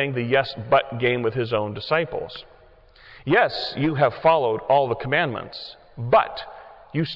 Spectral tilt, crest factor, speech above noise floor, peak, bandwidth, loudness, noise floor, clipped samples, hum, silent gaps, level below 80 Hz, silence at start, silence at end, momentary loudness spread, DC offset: -8 dB/octave; 16 dB; 29 dB; -6 dBFS; 6 kHz; -22 LUFS; -51 dBFS; under 0.1%; none; none; -54 dBFS; 0 s; 0 s; 16 LU; under 0.1%